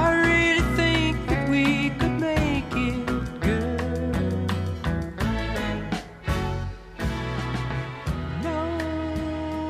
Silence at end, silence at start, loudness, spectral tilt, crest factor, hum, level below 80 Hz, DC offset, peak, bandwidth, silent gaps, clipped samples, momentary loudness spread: 0 s; 0 s; -25 LUFS; -6 dB/octave; 16 dB; none; -34 dBFS; under 0.1%; -8 dBFS; 15 kHz; none; under 0.1%; 10 LU